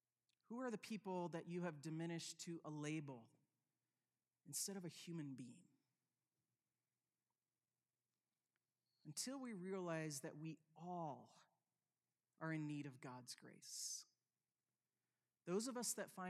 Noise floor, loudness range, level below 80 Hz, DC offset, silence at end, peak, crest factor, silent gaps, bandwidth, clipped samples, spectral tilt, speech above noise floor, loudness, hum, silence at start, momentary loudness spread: under -90 dBFS; 6 LU; under -90 dBFS; under 0.1%; 0 s; -34 dBFS; 20 dB; none; 15 kHz; under 0.1%; -4 dB/octave; over 40 dB; -50 LUFS; none; 0.5 s; 11 LU